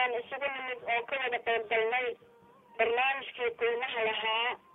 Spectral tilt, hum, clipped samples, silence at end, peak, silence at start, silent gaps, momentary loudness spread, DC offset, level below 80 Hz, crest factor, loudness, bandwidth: -4.5 dB/octave; none; under 0.1%; 0.15 s; -14 dBFS; 0 s; none; 6 LU; under 0.1%; -74 dBFS; 18 dB; -31 LUFS; 4 kHz